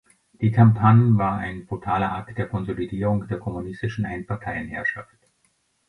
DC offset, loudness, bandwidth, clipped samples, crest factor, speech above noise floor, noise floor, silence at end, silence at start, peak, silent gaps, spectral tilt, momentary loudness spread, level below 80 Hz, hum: under 0.1%; -23 LUFS; 6 kHz; under 0.1%; 18 dB; 46 dB; -67 dBFS; 0.85 s; 0.4 s; -4 dBFS; none; -9.5 dB/octave; 14 LU; -48 dBFS; none